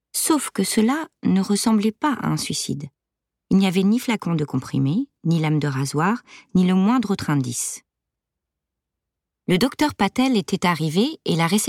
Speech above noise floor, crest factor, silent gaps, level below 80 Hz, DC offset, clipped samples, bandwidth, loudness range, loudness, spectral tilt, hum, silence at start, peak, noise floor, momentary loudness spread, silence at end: 64 dB; 14 dB; none; -58 dBFS; under 0.1%; under 0.1%; 16 kHz; 3 LU; -21 LUFS; -5 dB/octave; none; 0.15 s; -8 dBFS; -84 dBFS; 6 LU; 0 s